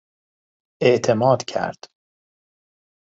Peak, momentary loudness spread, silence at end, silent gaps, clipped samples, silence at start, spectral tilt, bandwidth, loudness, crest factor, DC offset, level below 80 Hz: -2 dBFS; 9 LU; 1.4 s; none; under 0.1%; 0.8 s; -5.5 dB/octave; 8 kHz; -20 LUFS; 22 dB; under 0.1%; -64 dBFS